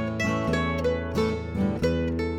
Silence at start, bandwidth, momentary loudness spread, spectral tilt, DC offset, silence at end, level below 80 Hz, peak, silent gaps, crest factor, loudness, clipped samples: 0 s; 14.5 kHz; 3 LU; -6.5 dB/octave; under 0.1%; 0 s; -40 dBFS; -12 dBFS; none; 14 dB; -26 LUFS; under 0.1%